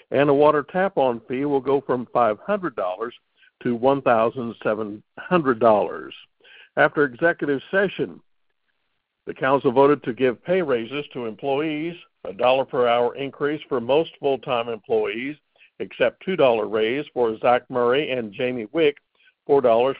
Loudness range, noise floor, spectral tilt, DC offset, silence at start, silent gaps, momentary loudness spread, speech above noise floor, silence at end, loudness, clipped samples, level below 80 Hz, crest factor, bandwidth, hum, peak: 2 LU; -75 dBFS; -10.5 dB/octave; under 0.1%; 0.1 s; none; 12 LU; 53 dB; 0 s; -22 LUFS; under 0.1%; -62 dBFS; 18 dB; 5 kHz; none; -4 dBFS